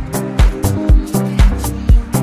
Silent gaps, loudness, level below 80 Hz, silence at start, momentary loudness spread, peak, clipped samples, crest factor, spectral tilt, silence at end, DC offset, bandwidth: none; -15 LUFS; -14 dBFS; 0 s; 4 LU; 0 dBFS; under 0.1%; 12 dB; -6.5 dB/octave; 0 s; under 0.1%; 15.5 kHz